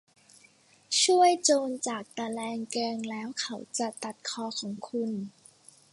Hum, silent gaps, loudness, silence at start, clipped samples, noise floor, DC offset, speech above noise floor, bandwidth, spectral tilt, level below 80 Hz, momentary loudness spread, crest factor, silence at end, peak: none; none; -29 LUFS; 0.9 s; under 0.1%; -61 dBFS; under 0.1%; 31 dB; 11.5 kHz; -2 dB/octave; -80 dBFS; 14 LU; 20 dB; 0.65 s; -10 dBFS